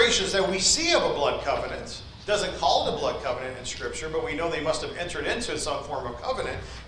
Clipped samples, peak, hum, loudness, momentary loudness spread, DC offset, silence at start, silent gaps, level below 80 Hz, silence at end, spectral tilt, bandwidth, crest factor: under 0.1%; -8 dBFS; none; -26 LUFS; 12 LU; under 0.1%; 0 s; none; -44 dBFS; 0 s; -2 dB/octave; 10.5 kHz; 18 dB